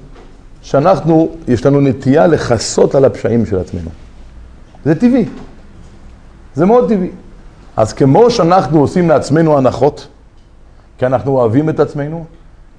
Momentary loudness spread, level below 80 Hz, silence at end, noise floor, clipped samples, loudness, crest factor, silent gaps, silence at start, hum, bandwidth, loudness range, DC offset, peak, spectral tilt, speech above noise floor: 12 LU; -36 dBFS; 0.5 s; -40 dBFS; 0.2%; -12 LUFS; 12 dB; none; 0 s; none; 10.5 kHz; 5 LU; under 0.1%; 0 dBFS; -7 dB/octave; 29 dB